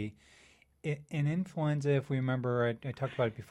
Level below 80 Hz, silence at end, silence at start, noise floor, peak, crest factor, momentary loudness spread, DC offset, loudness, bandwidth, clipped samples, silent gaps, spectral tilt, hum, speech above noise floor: -66 dBFS; 0.05 s; 0 s; -63 dBFS; -18 dBFS; 14 dB; 8 LU; under 0.1%; -33 LUFS; 11 kHz; under 0.1%; none; -8 dB/octave; none; 30 dB